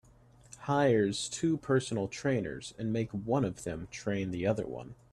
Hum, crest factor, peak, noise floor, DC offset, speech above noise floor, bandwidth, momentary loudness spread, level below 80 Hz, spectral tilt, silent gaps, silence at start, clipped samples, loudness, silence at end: none; 18 dB; -16 dBFS; -59 dBFS; under 0.1%; 28 dB; 12.5 kHz; 12 LU; -60 dBFS; -5.5 dB/octave; none; 0.5 s; under 0.1%; -32 LUFS; 0.2 s